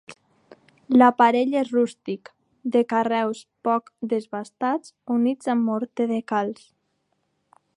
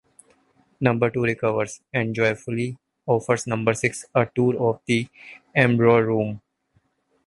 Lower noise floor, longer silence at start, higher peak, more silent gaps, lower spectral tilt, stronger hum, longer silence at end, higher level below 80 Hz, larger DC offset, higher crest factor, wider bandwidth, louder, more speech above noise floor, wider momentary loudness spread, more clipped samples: first, -72 dBFS vs -67 dBFS; second, 0.1 s vs 0.8 s; about the same, -4 dBFS vs -2 dBFS; neither; about the same, -6 dB/octave vs -6 dB/octave; neither; first, 1.25 s vs 0.9 s; second, -76 dBFS vs -58 dBFS; neither; about the same, 20 dB vs 20 dB; about the same, 10.5 kHz vs 11.5 kHz; about the same, -23 LUFS vs -22 LUFS; first, 50 dB vs 45 dB; first, 15 LU vs 10 LU; neither